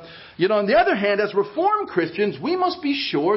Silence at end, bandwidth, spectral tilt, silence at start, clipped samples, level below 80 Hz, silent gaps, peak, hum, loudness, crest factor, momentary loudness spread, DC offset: 0 s; 5.8 kHz; -9.5 dB/octave; 0 s; under 0.1%; -58 dBFS; none; -6 dBFS; none; -21 LUFS; 14 dB; 6 LU; under 0.1%